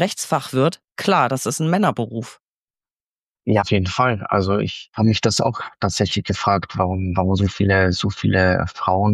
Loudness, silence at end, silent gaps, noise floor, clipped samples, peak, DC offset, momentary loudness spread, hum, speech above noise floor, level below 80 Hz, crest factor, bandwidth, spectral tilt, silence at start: -20 LUFS; 0 s; 2.40-2.66 s, 2.92-3.22 s, 3.28-3.32 s; under -90 dBFS; under 0.1%; -4 dBFS; under 0.1%; 6 LU; none; over 71 dB; -46 dBFS; 16 dB; 14 kHz; -5.5 dB/octave; 0 s